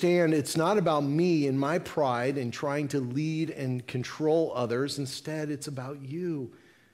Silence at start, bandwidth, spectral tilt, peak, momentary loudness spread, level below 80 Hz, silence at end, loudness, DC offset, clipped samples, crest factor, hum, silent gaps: 0 s; 16 kHz; -6 dB/octave; -14 dBFS; 10 LU; -70 dBFS; 0.4 s; -29 LUFS; under 0.1%; under 0.1%; 16 dB; none; none